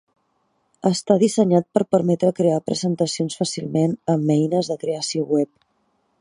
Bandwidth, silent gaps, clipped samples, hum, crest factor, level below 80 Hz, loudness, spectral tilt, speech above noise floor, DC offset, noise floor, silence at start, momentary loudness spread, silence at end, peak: 11.5 kHz; none; under 0.1%; none; 20 dB; -66 dBFS; -21 LUFS; -6 dB/octave; 48 dB; under 0.1%; -68 dBFS; 0.85 s; 6 LU; 0.75 s; -2 dBFS